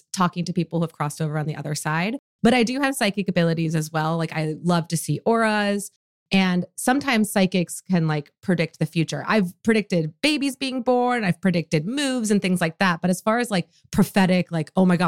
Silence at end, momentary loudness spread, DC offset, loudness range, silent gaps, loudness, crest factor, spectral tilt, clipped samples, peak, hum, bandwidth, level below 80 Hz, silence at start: 0 s; 6 LU; 0.1%; 1 LU; 2.19-2.39 s, 5.96-6.26 s; -22 LUFS; 14 dB; -5.5 dB/octave; under 0.1%; -8 dBFS; none; 16 kHz; -56 dBFS; 0.15 s